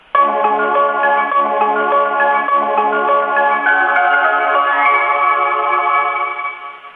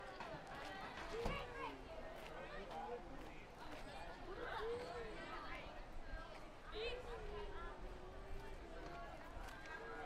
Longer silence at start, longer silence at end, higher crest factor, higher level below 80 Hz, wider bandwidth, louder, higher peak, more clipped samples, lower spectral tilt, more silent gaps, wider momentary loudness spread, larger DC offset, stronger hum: first, 0.15 s vs 0 s; about the same, 0.05 s vs 0 s; second, 14 dB vs 20 dB; second, -66 dBFS vs -56 dBFS; second, 4.3 kHz vs 15.5 kHz; first, -14 LUFS vs -51 LUFS; first, -2 dBFS vs -30 dBFS; neither; about the same, -6 dB/octave vs -5 dB/octave; neither; second, 3 LU vs 8 LU; neither; neither